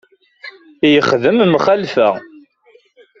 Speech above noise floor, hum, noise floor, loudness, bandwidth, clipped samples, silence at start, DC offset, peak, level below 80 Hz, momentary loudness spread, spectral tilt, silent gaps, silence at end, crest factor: 39 dB; none; -52 dBFS; -13 LUFS; 7.4 kHz; under 0.1%; 0.45 s; under 0.1%; 0 dBFS; -56 dBFS; 23 LU; -6 dB/octave; none; 0.95 s; 16 dB